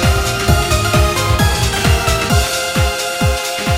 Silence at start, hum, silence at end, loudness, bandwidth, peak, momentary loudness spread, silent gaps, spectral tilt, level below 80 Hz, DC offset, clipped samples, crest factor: 0 s; none; 0 s; -14 LUFS; 16.5 kHz; 0 dBFS; 3 LU; none; -4 dB/octave; -20 dBFS; under 0.1%; under 0.1%; 14 dB